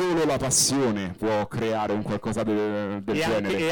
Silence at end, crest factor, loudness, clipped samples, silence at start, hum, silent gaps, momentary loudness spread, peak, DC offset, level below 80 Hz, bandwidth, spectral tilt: 0 s; 14 dB; -25 LUFS; under 0.1%; 0 s; none; none; 8 LU; -10 dBFS; under 0.1%; -52 dBFS; 19 kHz; -4 dB/octave